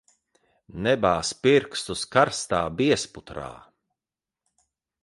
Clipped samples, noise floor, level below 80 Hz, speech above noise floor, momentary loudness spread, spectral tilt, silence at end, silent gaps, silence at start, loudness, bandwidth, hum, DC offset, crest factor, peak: under 0.1%; under -90 dBFS; -54 dBFS; over 66 dB; 16 LU; -4 dB/octave; 1.45 s; none; 0.75 s; -23 LUFS; 11.5 kHz; none; under 0.1%; 22 dB; -6 dBFS